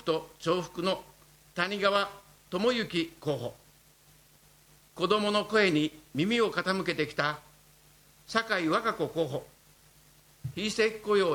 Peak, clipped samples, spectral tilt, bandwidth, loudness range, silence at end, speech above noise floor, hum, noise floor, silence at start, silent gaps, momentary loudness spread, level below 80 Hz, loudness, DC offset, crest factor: -10 dBFS; under 0.1%; -4.5 dB/octave; 19.5 kHz; 4 LU; 0 s; 31 dB; 50 Hz at -60 dBFS; -60 dBFS; 0.05 s; none; 10 LU; -64 dBFS; -29 LUFS; under 0.1%; 20 dB